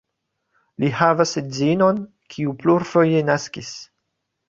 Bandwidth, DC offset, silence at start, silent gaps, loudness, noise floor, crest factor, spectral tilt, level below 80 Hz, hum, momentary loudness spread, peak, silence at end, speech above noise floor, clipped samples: 7.8 kHz; under 0.1%; 0.8 s; none; -19 LUFS; -76 dBFS; 20 dB; -6 dB/octave; -60 dBFS; none; 15 LU; -2 dBFS; 0.65 s; 57 dB; under 0.1%